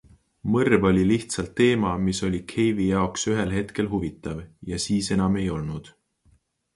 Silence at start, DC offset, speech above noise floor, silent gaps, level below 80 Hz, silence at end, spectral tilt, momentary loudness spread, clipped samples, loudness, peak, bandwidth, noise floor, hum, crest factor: 0.45 s; under 0.1%; 39 dB; none; -44 dBFS; 0.85 s; -5.5 dB/octave; 14 LU; under 0.1%; -24 LUFS; -4 dBFS; 11.5 kHz; -63 dBFS; none; 20 dB